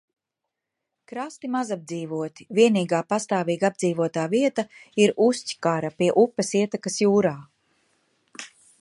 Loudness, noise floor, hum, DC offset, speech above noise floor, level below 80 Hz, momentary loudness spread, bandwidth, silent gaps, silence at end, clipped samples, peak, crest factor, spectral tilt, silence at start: -23 LUFS; -84 dBFS; none; under 0.1%; 61 dB; -72 dBFS; 15 LU; 11.5 kHz; none; 0.35 s; under 0.1%; -4 dBFS; 20 dB; -5 dB/octave; 1.1 s